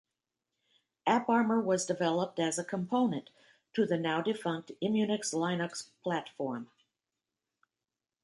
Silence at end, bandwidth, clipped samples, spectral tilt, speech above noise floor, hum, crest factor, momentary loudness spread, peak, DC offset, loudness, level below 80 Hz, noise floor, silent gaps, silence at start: 1.6 s; 11.5 kHz; under 0.1%; -4.5 dB/octave; over 58 dB; none; 22 dB; 10 LU; -12 dBFS; under 0.1%; -32 LUFS; -80 dBFS; under -90 dBFS; none; 1.05 s